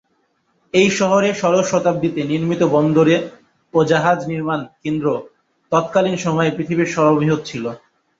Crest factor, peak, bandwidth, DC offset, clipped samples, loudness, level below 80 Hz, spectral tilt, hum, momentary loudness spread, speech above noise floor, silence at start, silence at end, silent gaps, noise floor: 16 dB; -2 dBFS; 7.8 kHz; under 0.1%; under 0.1%; -17 LUFS; -56 dBFS; -6 dB/octave; none; 9 LU; 48 dB; 0.75 s; 0.45 s; none; -65 dBFS